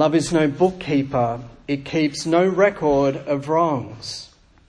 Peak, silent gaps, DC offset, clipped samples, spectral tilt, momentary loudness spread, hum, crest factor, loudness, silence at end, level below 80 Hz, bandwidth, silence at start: -4 dBFS; none; under 0.1%; under 0.1%; -6 dB/octave; 13 LU; none; 16 dB; -20 LUFS; 0.45 s; -50 dBFS; 10.5 kHz; 0 s